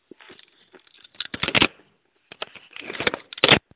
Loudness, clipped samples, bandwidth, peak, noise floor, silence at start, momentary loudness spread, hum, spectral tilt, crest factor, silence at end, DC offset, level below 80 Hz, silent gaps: -21 LUFS; under 0.1%; 4 kHz; -2 dBFS; -64 dBFS; 1.2 s; 20 LU; none; -1 dB/octave; 26 dB; 0.2 s; under 0.1%; -52 dBFS; none